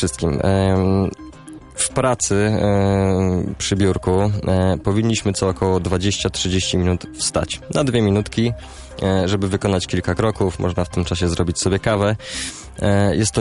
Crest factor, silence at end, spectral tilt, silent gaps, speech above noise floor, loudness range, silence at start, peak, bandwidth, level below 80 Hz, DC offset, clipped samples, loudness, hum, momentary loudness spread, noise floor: 14 dB; 0 s; -5 dB/octave; none; 20 dB; 2 LU; 0 s; -4 dBFS; 11.5 kHz; -36 dBFS; under 0.1%; under 0.1%; -19 LUFS; none; 6 LU; -38 dBFS